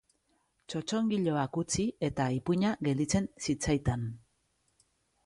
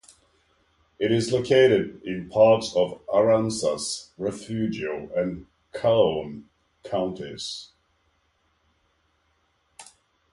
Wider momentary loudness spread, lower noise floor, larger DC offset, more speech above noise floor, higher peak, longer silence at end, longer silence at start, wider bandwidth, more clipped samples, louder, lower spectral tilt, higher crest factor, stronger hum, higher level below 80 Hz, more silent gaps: second, 8 LU vs 15 LU; first, -75 dBFS vs -69 dBFS; neither; about the same, 44 dB vs 46 dB; second, -16 dBFS vs -6 dBFS; first, 1.05 s vs 0.5 s; second, 0.7 s vs 1 s; about the same, 11.5 kHz vs 11.5 kHz; neither; second, -32 LUFS vs -24 LUFS; about the same, -5.5 dB/octave vs -5 dB/octave; about the same, 16 dB vs 20 dB; neither; first, -52 dBFS vs -58 dBFS; neither